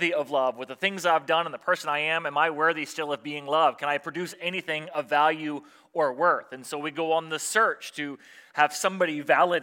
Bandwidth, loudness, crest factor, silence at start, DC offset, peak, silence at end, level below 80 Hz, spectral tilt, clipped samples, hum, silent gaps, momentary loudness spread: 17 kHz; -26 LUFS; 20 dB; 0 s; under 0.1%; -6 dBFS; 0 s; -88 dBFS; -3 dB/octave; under 0.1%; none; none; 11 LU